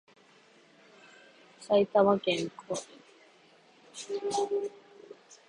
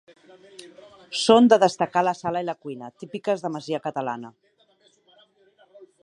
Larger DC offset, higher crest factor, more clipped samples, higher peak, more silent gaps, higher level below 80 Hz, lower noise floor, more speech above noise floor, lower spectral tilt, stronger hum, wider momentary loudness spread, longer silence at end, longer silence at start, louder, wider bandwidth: neither; about the same, 22 dB vs 22 dB; neither; second, -10 dBFS vs -2 dBFS; neither; about the same, -74 dBFS vs -70 dBFS; about the same, -60 dBFS vs -62 dBFS; second, 32 dB vs 39 dB; about the same, -4.5 dB/octave vs -4.5 dB/octave; neither; first, 27 LU vs 20 LU; second, 0.15 s vs 1.75 s; first, 1.6 s vs 0.6 s; second, -30 LUFS vs -22 LUFS; about the same, 11 kHz vs 11 kHz